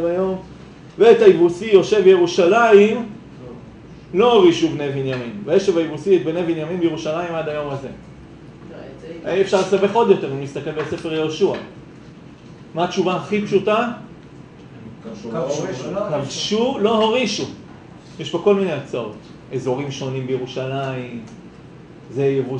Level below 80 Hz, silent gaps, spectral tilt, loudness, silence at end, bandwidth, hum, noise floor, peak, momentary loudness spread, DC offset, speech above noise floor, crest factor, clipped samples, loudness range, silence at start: -54 dBFS; none; -5.5 dB/octave; -18 LUFS; 0 s; 8.8 kHz; none; -40 dBFS; 0 dBFS; 23 LU; under 0.1%; 23 dB; 18 dB; under 0.1%; 9 LU; 0 s